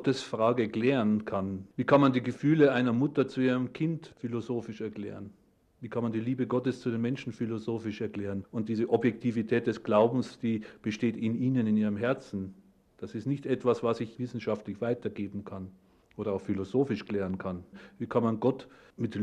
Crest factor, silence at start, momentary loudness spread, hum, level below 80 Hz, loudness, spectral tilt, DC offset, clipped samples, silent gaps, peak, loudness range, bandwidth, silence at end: 20 dB; 0 s; 13 LU; none; -68 dBFS; -30 LUFS; -7.5 dB/octave; under 0.1%; under 0.1%; none; -10 dBFS; 7 LU; 9.6 kHz; 0 s